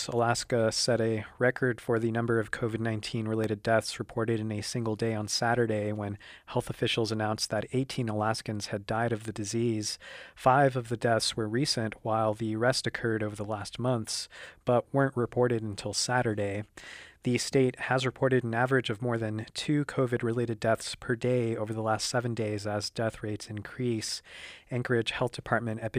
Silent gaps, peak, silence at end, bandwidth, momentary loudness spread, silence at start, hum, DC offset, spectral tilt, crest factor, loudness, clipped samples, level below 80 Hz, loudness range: none; -10 dBFS; 0 s; 15.5 kHz; 8 LU; 0 s; none; under 0.1%; -5 dB/octave; 20 dB; -30 LUFS; under 0.1%; -60 dBFS; 3 LU